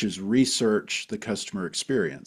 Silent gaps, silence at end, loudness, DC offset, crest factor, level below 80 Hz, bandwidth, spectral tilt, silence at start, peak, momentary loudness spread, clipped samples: none; 0.1 s; -26 LUFS; under 0.1%; 16 dB; -62 dBFS; 14 kHz; -4 dB/octave; 0 s; -10 dBFS; 9 LU; under 0.1%